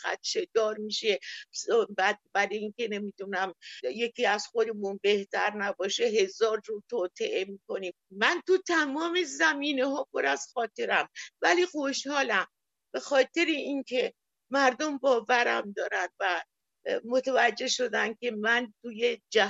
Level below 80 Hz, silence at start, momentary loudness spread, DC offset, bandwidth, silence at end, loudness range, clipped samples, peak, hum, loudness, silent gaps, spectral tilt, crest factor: -82 dBFS; 0 s; 9 LU; under 0.1%; 8.2 kHz; 0 s; 3 LU; under 0.1%; -8 dBFS; none; -28 LUFS; none; -2.5 dB/octave; 20 dB